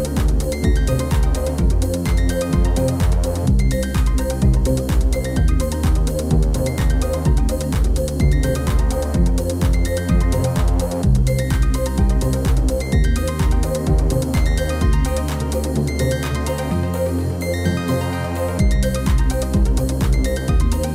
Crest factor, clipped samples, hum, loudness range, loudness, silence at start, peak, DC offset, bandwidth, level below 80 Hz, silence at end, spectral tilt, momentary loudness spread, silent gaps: 12 dB; under 0.1%; none; 2 LU; -19 LUFS; 0 s; -6 dBFS; under 0.1%; 15.5 kHz; -20 dBFS; 0 s; -6.5 dB/octave; 3 LU; none